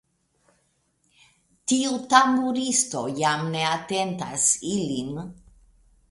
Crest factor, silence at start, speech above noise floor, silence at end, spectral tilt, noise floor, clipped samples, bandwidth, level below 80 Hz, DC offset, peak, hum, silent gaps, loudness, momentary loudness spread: 24 dB; 1.65 s; 45 dB; 0.8 s; -3 dB/octave; -69 dBFS; under 0.1%; 11.5 kHz; -60 dBFS; under 0.1%; -2 dBFS; none; none; -23 LUFS; 12 LU